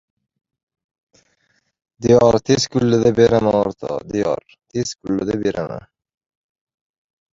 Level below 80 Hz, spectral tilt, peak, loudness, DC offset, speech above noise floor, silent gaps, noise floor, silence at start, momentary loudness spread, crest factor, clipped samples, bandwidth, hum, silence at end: -48 dBFS; -6 dB/octave; -2 dBFS; -18 LUFS; under 0.1%; 48 dB; none; -65 dBFS; 2 s; 14 LU; 18 dB; under 0.1%; 7.8 kHz; none; 1.6 s